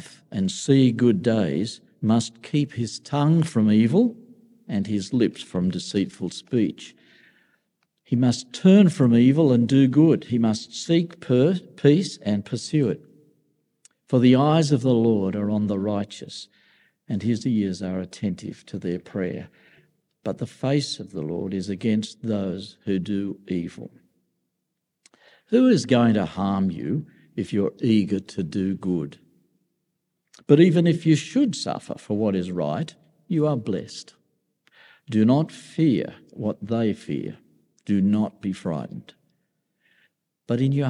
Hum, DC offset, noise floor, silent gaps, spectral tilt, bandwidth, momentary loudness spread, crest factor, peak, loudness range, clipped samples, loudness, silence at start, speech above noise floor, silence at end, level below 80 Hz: none; under 0.1%; -79 dBFS; none; -7 dB/octave; 11 kHz; 14 LU; 20 dB; -4 dBFS; 9 LU; under 0.1%; -23 LUFS; 0.05 s; 58 dB; 0 s; -68 dBFS